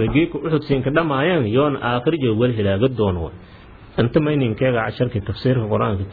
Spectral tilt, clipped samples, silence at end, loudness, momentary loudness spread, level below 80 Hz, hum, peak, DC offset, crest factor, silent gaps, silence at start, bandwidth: -10.5 dB/octave; under 0.1%; 0 s; -19 LUFS; 5 LU; -42 dBFS; none; -4 dBFS; under 0.1%; 16 dB; none; 0 s; 4.9 kHz